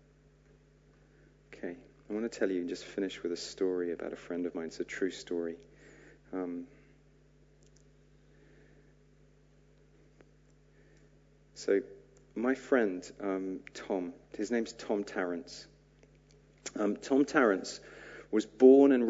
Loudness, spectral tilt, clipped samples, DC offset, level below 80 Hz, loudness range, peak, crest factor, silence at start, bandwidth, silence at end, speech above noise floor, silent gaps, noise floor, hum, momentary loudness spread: -32 LUFS; -5 dB/octave; under 0.1%; under 0.1%; -66 dBFS; 10 LU; -10 dBFS; 24 dB; 1.55 s; 8 kHz; 0 s; 32 dB; none; -63 dBFS; 50 Hz at -65 dBFS; 18 LU